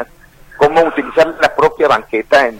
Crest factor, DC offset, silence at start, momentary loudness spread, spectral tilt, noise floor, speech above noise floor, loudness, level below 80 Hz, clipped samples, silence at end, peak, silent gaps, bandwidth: 14 dB; under 0.1%; 0 s; 4 LU; -4.5 dB/octave; -41 dBFS; 29 dB; -13 LUFS; -44 dBFS; under 0.1%; 0 s; 0 dBFS; none; 16 kHz